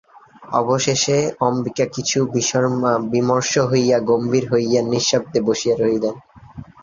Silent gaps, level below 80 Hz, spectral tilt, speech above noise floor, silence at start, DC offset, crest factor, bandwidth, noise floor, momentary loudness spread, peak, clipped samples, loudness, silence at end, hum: none; -54 dBFS; -4.5 dB/octave; 21 dB; 0.4 s; under 0.1%; 16 dB; 7.6 kHz; -39 dBFS; 5 LU; -4 dBFS; under 0.1%; -18 LUFS; 0.2 s; none